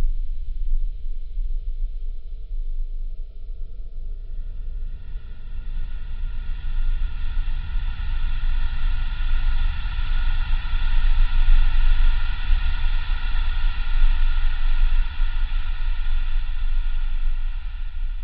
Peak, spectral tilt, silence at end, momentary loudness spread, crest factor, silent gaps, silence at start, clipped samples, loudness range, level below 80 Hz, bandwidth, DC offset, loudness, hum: -4 dBFS; -8.5 dB/octave; 0 s; 13 LU; 14 dB; none; 0 s; under 0.1%; 11 LU; -20 dBFS; 4.5 kHz; under 0.1%; -30 LUFS; none